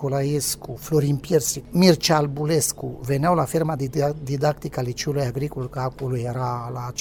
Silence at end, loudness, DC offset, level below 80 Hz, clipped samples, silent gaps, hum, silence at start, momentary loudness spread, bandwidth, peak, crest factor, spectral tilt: 0 s; -23 LUFS; under 0.1%; -48 dBFS; under 0.1%; none; none; 0 s; 10 LU; 18 kHz; -4 dBFS; 20 dB; -5 dB/octave